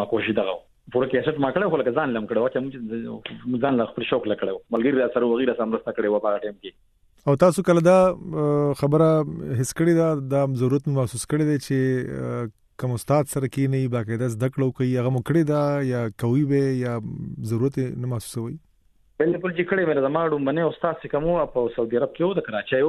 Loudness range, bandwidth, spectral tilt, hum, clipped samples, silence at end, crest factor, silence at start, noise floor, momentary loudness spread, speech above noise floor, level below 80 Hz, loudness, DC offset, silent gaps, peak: 4 LU; 14 kHz; -7 dB/octave; none; under 0.1%; 0 s; 18 dB; 0 s; -60 dBFS; 10 LU; 37 dB; -54 dBFS; -23 LUFS; under 0.1%; none; -4 dBFS